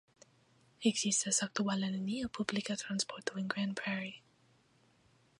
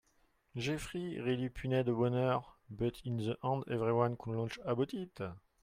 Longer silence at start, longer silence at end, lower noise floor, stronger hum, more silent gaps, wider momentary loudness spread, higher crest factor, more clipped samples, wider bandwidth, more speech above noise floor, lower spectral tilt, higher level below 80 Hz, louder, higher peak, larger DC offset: first, 0.8 s vs 0.55 s; first, 1.2 s vs 0.25 s; second, -69 dBFS vs -73 dBFS; neither; neither; about the same, 8 LU vs 10 LU; first, 24 dB vs 18 dB; neither; second, 11 kHz vs 15 kHz; about the same, 34 dB vs 37 dB; second, -3 dB/octave vs -7 dB/octave; second, -72 dBFS vs -60 dBFS; about the same, -35 LUFS vs -36 LUFS; first, -14 dBFS vs -18 dBFS; neither